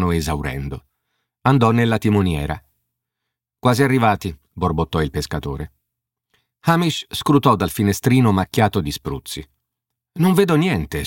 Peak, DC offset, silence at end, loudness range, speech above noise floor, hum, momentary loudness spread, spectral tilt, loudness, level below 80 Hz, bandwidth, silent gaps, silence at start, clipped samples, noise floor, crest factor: -2 dBFS; under 0.1%; 0 s; 3 LU; 64 dB; none; 14 LU; -6 dB/octave; -19 LUFS; -38 dBFS; 17 kHz; none; 0 s; under 0.1%; -81 dBFS; 18 dB